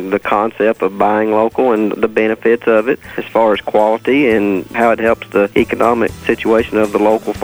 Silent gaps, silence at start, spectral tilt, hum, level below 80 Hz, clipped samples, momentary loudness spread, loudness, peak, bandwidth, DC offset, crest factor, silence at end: none; 0 s; -6 dB/octave; none; -44 dBFS; under 0.1%; 3 LU; -14 LUFS; 0 dBFS; over 20 kHz; under 0.1%; 14 dB; 0 s